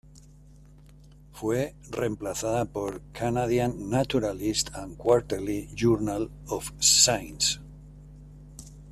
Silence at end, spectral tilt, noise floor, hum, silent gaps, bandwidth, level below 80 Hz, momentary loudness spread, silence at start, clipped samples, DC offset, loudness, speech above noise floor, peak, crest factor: 0 s; -3.5 dB/octave; -51 dBFS; 50 Hz at -45 dBFS; none; 14.5 kHz; -48 dBFS; 14 LU; 0.15 s; under 0.1%; under 0.1%; -26 LUFS; 24 dB; -4 dBFS; 24 dB